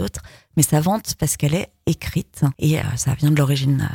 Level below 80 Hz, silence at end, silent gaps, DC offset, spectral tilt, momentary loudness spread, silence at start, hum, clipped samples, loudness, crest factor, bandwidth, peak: -42 dBFS; 0 s; none; under 0.1%; -5.5 dB/octave; 8 LU; 0 s; none; under 0.1%; -20 LUFS; 18 dB; 17.5 kHz; -2 dBFS